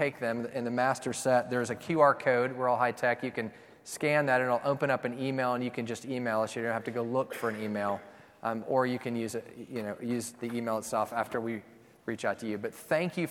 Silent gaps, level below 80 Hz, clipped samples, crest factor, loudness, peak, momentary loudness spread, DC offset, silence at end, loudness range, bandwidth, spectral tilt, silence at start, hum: none; -74 dBFS; under 0.1%; 20 dB; -31 LUFS; -10 dBFS; 11 LU; under 0.1%; 0 s; 6 LU; 17.5 kHz; -5.5 dB/octave; 0 s; none